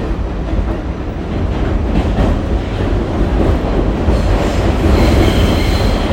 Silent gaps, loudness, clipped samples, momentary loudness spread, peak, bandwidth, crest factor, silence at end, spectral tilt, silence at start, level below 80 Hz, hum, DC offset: none; -15 LUFS; under 0.1%; 9 LU; 0 dBFS; 16.5 kHz; 12 dB; 0 s; -7 dB/octave; 0 s; -16 dBFS; none; under 0.1%